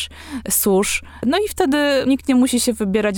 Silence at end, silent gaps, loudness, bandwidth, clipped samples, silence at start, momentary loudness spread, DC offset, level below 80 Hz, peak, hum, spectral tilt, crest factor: 0 s; none; -18 LUFS; 19.5 kHz; under 0.1%; 0 s; 6 LU; under 0.1%; -42 dBFS; -4 dBFS; none; -3.5 dB/octave; 14 dB